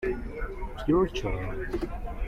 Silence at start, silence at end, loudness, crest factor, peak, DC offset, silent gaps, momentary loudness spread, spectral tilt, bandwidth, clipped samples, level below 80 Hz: 0 s; 0 s; -31 LUFS; 16 dB; -14 dBFS; under 0.1%; none; 12 LU; -7 dB/octave; 13.5 kHz; under 0.1%; -36 dBFS